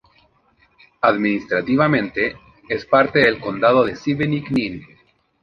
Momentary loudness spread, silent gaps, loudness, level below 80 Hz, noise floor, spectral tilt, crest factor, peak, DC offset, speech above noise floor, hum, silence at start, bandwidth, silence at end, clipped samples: 9 LU; none; -18 LUFS; -52 dBFS; -59 dBFS; -7.5 dB/octave; 18 dB; 0 dBFS; under 0.1%; 41 dB; none; 1.05 s; 7 kHz; 0.6 s; under 0.1%